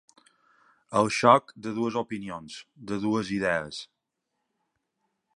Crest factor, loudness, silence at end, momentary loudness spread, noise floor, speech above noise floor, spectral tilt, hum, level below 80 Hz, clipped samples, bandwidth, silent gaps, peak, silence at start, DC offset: 26 dB; -26 LUFS; 1.5 s; 19 LU; -82 dBFS; 55 dB; -5 dB/octave; none; -64 dBFS; under 0.1%; 11.5 kHz; none; -4 dBFS; 0.9 s; under 0.1%